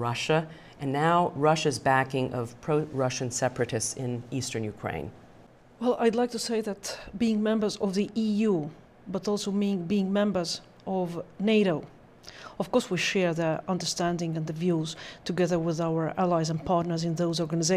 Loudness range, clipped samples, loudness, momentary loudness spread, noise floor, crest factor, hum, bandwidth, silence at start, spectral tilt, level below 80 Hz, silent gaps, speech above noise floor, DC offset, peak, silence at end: 4 LU; under 0.1%; -28 LUFS; 10 LU; -54 dBFS; 18 dB; none; 15 kHz; 0 s; -5 dB/octave; -58 dBFS; none; 26 dB; under 0.1%; -10 dBFS; 0 s